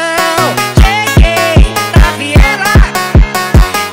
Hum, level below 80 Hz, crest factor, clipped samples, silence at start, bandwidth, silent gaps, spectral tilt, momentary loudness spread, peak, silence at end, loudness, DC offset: none; -10 dBFS; 8 dB; 4%; 0 s; 16.5 kHz; none; -5 dB/octave; 2 LU; 0 dBFS; 0 s; -9 LUFS; 0.3%